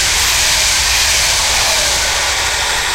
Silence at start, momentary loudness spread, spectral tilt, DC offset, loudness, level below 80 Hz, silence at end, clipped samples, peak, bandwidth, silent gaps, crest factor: 0 s; 3 LU; 0.5 dB/octave; under 0.1%; -11 LUFS; -28 dBFS; 0 s; under 0.1%; 0 dBFS; 16 kHz; none; 12 dB